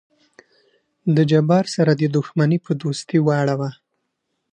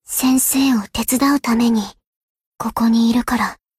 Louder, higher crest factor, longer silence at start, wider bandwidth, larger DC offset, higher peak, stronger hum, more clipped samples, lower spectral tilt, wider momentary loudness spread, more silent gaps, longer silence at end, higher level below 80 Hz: about the same, -19 LUFS vs -17 LUFS; about the same, 16 dB vs 14 dB; first, 1.05 s vs 0.1 s; second, 9.8 kHz vs 16 kHz; neither; about the same, -4 dBFS vs -4 dBFS; neither; neither; first, -7 dB/octave vs -3 dB/octave; about the same, 8 LU vs 8 LU; second, none vs 2.07-2.35 s, 2.46-2.52 s; first, 0.8 s vs 0.25 s; second, -64 dBFS vs -44 dBFS